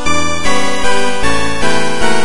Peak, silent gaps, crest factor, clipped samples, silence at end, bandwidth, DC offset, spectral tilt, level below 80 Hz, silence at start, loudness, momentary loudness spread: 0 dBFS; none; 14 dB; under 0.1%; 0 s; 11.5 kHz; 40%; -3 dB/octave; -30 dBFS; 0 s; -15 LUFS; 1 LU